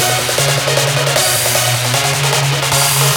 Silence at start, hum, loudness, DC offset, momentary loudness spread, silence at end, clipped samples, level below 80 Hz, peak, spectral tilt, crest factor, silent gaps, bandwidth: 0 s; none; -12 LUFS; under 0.1%; 2 LU; 0 s; under 0.1%; -44 dBFS; 0 dBFS; -2.5 dB/octave; 14 dB; none; over 20 kHz